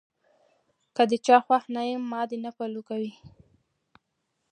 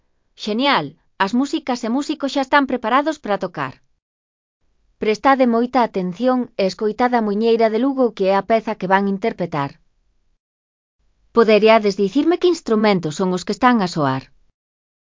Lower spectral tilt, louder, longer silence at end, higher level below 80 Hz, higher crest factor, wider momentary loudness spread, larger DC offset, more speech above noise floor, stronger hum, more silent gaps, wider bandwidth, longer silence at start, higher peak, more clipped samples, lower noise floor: second, -4.5 dB/octave vs -6 dB/octave; second, -26 LUFS vs -18 LUFS; first, 1.25 s vs 0.85 s; second, -74 dBFS vs -58 dBFS; about the same, 22 dB vs 18 dB; first, 15 LU vs 8 LU; neither; first, 53 dB vs 44 dB; neither; second, none vs 4.02-4.60 s, 10.40-10.99 s; first, 10 kHz vs 7.6 kHz; first, 0.95 s vs 0.4 s; second, -6 dBFS vs 0 dBFS; neither; first, -78 dBFS vs -62 dBFS